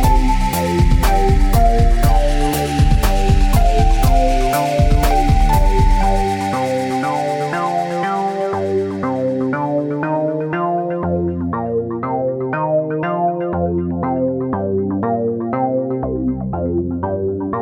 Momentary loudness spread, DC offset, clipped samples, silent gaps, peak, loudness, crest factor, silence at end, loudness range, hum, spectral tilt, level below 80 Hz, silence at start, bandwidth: 5 LU; under 0.1%; under 0.1%; none; -2 dBFS; -18 LUFS; 12 dB; 0 s; 4 LU; none; -6.5 dB/octave; -18 dBFS; 0 s; 19 kHz